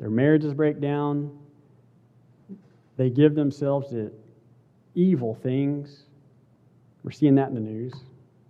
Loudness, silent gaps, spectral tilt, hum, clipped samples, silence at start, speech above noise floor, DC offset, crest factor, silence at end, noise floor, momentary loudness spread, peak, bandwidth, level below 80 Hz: -24 LUFS; none; -9.5 dB/octave; none; under 0.1%; 0 s; 35 dB; under 0.1%; 20 dB; 0.5 s; -58 dBFS; 17 LU; -6 dBFS; 7.4 kHz; -72 dBFS